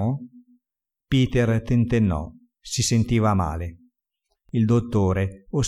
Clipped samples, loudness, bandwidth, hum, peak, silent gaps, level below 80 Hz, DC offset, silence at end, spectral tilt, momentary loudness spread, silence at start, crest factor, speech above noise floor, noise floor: under 0.1%; -23 LUFS; 12.5 kHz; none; -10 dBFS; none; -40 dBFS; under 0.1%; 0 s; -6 dB/octave; 10 LU; 0 s; 14 dB; 66 dB; -88 dBFS